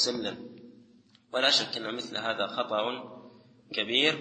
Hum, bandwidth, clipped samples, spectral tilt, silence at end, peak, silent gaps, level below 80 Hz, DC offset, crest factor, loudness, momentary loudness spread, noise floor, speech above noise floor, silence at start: none; 8.8 kHz; under 0.1%; -2 dB/octave; 0 s; -8 dBFS; none; -76 dBFS; under 0.1%; 22 dB; -28 LUFS; 17 LU; -60 dBFS; 31 dB; 0 s